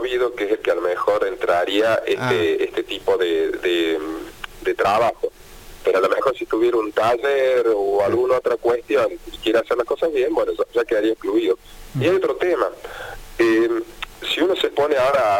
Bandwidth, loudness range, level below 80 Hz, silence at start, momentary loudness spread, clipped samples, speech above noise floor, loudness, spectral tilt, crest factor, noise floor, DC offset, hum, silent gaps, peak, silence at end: 17 kHz; 2 LU; -48 dBFS; 0 s; 8 LU; under 0.1%; 21 dB; -20 LUFS; -5 dB/octave; 14 dB; -41 dBFS; under 0.1%; none; none; -4 dBFS; 0 s